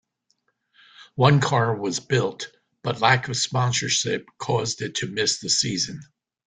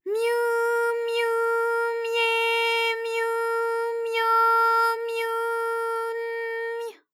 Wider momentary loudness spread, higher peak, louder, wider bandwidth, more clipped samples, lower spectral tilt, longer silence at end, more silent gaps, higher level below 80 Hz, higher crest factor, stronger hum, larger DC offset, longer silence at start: about the same, 11 LU vs 10 LU; first, -2 dBFS vs -12 dBFS; about the same, -22 LUFS vs -24 LUFS; second, 9.6 kHz vs 16.5 kHz; neither; first, -3.5 dB/octave vs 2.5 dB/octave; first, 0.4 s vs 0.2 s; neither; first, -58 dBFS vs under -90 dBFS; first, 22 dB vs 12 dB; neither; neither; first, 1 s vs 0.05 s